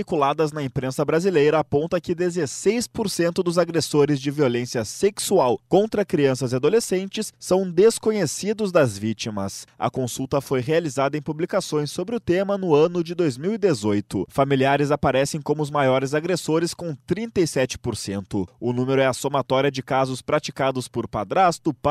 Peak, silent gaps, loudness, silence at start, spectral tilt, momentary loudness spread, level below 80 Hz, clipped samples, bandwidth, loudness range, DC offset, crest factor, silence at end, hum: -4 dBFS; none; -22 LUFS; 0 s; -5.5 dB/octave; 8 LU; -54 dBFS; under 0.1%; 15 kHz; 3 LU; under 0.1%; 16 dB; 0 s; none